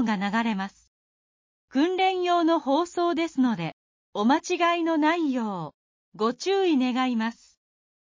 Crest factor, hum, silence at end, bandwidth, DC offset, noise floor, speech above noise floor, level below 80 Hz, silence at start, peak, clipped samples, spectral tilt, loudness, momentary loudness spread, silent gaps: 14 dB; none; 0.8 s; 7.6 kHz; under 0.1%; under -90 dBFS; over 66 dB; -72 dBFS; 0 s; -10 dBFS; under 0.1%; -5 dB/octave; -25 LUFS; 9 LU; 0.87-1.68 s, 3.73-4.13 s, 5.74-6.12 s